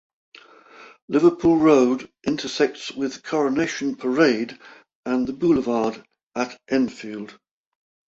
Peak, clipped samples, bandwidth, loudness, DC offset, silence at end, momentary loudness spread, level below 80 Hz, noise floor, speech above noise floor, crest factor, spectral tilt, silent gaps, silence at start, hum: -4 dBFS; under 0.1%; 7.8 kHz; -22 LUFS; under 0.1%; 0.75 s; 16 LU; -58 dBFS; -47 dBFS; 26 dB; 20 dB; -5.5 dB/octave; 1.02-1.08 s, 4.95-5.03 s, 6.23-6.27 s; 0.8 s; none